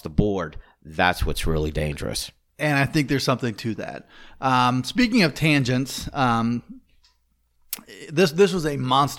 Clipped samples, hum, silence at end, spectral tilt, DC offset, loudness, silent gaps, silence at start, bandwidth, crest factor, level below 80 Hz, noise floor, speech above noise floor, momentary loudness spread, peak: under 0.1%; none; 0 s; -5.5 dB/octave; under 0.1%; -22 LUFS; none; 0.05 s; 18.5 kHz; 20 dB; -38 dBFS; -66 dBFS; 44 dB; 15 LU; -4 dBFS